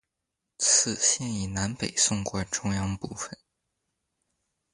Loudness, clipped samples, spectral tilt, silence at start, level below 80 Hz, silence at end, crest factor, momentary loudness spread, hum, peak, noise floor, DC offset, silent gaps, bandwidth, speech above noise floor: -25 LUFS; under 0.1%; -2.5 dB/octave; 0.6 s; -52 dBFS; 1.4 s; 22 dB; 14 LU; none; -8 dBFS; -84 dBFS; under 0.1%; none; 11.5 kHz; 55 dB